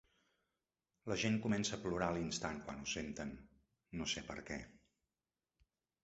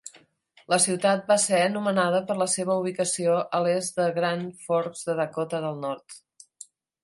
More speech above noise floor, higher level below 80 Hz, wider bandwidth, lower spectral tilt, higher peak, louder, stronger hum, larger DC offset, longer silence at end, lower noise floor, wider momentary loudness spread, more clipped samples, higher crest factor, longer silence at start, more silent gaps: first, over 49 dB vs 35 dB; first, -64 dBFS vs -74 dBFS; second, 8 kHz vs 11.5 kHz; about the same, -4 dB/octave vs -3.5 dB/octave; second, -20 dBFS vs -8 dBFS; second, -41 LUFS vs -25 LUFS; neither; neither; first, 1.25 s vs 0.85 s; first, under -90 dBFS vs -60 dBFS; about the same, 13 LU vs 11 LU; neither; about the same, 22 dB vs 18 dB; first, 1.05 s vs 0.05 s; neither